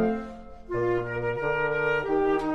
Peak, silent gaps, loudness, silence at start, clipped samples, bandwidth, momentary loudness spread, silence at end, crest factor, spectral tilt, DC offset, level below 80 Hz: -14 dBFS; none; -27 LUFS; 0 s; under 0.1%; 8.2 kHz; 9 LU; 0 s; 14 dB; -7.5 dB/octave; under 0.1%; -48 dBFS